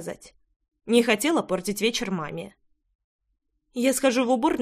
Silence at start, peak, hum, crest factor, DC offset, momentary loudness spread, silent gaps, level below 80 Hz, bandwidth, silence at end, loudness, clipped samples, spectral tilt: 0 s; -6 dBFS; none; 20 dB; under 0.1%; 17 LU; 0.56-0.60 s, 2.95-3.19 s; -60 dBFS; 15.5 kHz; 0 s; -24 LUFS; under 0.1%; -3.5 dB/octave